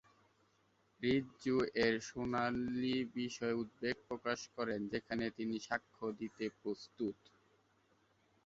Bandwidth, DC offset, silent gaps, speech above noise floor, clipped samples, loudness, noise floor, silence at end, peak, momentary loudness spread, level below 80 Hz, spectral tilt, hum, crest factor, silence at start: 7.6 kHz; under 0.1%; none; 36 dB; under 0.1%; -39 LUFS; -75 dBFS; 1.3 s; -18 dBFS; 8 LU; -70 dBFS; -4 dB/octave; none; 22 dB; 1 s